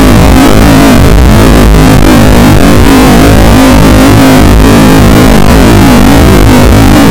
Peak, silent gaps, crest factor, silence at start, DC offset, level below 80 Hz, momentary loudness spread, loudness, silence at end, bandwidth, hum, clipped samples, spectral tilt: 0 dBFS; none; 0 dB; 0 s; under 0.1%; -8 dBFS; 1 LU; -2 LUFS; 0 s; over 20 kHz; none; 20%; -6 dB/octave